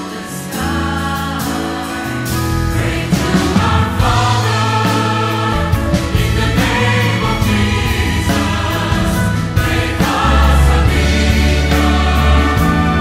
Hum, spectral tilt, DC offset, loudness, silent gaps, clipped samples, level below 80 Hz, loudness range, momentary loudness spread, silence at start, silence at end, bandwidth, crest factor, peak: none; -5.5 dB/octave; under 0.1%; -14 LUFS; none; under 0.1%; -20 dBFS; 4 LU; 7 LU; 0 s; 0 s; 16.5 kHz; 14 dB; 0 dBFS